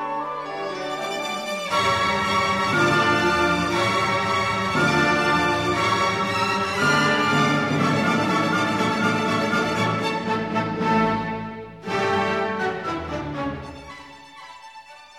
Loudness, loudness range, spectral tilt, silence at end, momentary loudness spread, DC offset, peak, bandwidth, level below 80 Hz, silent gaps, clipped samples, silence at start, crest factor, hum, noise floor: -21 LUFS; 5 LU; -4.5 dB/octave; 0 s; 11 LU; under 0.1%; -8 dBFS; 16 kHz; -50 dBFS; none; under 0.1%; 0 s; 16 dB; none; -44 dBFS